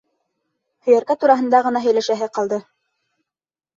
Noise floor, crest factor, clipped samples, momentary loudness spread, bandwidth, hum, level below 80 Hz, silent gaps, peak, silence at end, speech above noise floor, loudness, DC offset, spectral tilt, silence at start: -90 dBFS; 18 dB; under 0.1%; 9 LU; 7.6 kHz; none; -70 dBFS; none; -2 dBFS; 1.15 s; 73 dB; -18 LUFS; under 0.1%; -4.5 dB/octave; 0.85 s